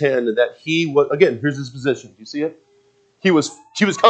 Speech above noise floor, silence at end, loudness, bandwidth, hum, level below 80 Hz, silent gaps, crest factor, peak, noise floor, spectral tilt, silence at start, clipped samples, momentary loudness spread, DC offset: 40 dB; 0 s; -19 LUFS; 9 kHz; none; -68 dBFS; none; 18 dB; 0 dBFS; -58 dBFS; -5 dB/octave; 0 s; under 0.1%; 10 LU; under 0.1%